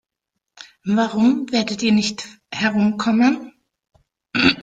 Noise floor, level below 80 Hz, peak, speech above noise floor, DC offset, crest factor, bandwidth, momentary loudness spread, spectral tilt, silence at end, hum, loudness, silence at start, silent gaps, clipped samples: -80 dBFS; -56 dBFS; -2 dBFS; 62 dB; under 0.1%; 18 dB; 9 kHz; 11 LU; -4.5 dB/octave; 0 s; none; -19 LUFS; 0.6 s; none; under 0.1%